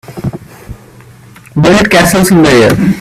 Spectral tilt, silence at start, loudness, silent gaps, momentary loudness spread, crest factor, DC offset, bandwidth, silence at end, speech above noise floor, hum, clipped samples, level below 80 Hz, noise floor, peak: -5 dB/octave; 0.1 s; -7 LUFS; none; 15 LU; 10 dB; under 0.1%; 16 kHz; 0 s; 29 dB; none; 0.2%; -32 dBFS; -35 dBFS; 0 dBFS